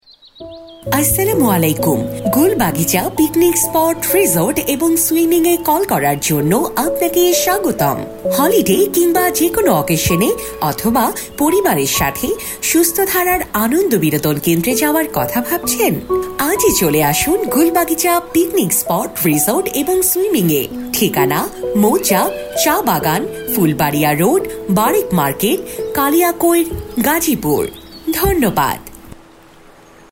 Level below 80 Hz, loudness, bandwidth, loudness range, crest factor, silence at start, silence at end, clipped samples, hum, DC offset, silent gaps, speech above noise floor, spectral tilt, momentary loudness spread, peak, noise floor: -40 dBFS; -14 LUFS; 16.5 kHz; 2 LU; 14 dB; 0.4 s; 0.95 s; under 0.1%; none; under 0.1%; none; 28 dB; -4 dB/octave; 6 LU; 0 dBFS; -42 dBFS